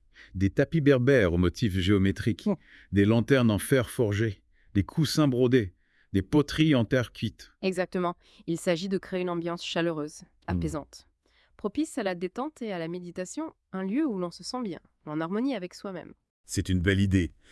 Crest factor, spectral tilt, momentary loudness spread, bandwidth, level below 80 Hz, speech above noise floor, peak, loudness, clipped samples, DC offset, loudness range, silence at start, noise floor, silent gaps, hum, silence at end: 18 dB; -6.5 dB/octave; 14 LU; 12 kHz; -52 dBFS; 39 dB; -8 dBFS; -28 LUFS; under 0.1%; under 0.1%; 8 LU; 0.2 s; -66 dBFS; 16.30-16.44 s; none; 0.2 s